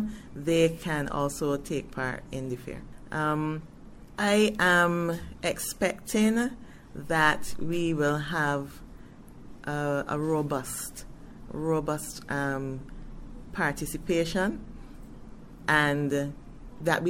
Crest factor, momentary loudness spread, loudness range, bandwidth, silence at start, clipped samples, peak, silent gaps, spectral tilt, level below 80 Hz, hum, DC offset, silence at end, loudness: 20 dB; 23 LU; 6 LU; 16.5 kHz; 0 s; under 0.1%; -8 dBFS; none; -5 dB/octave; -48 dBFS; none; under 0.1%; 0 s; -28 LUFS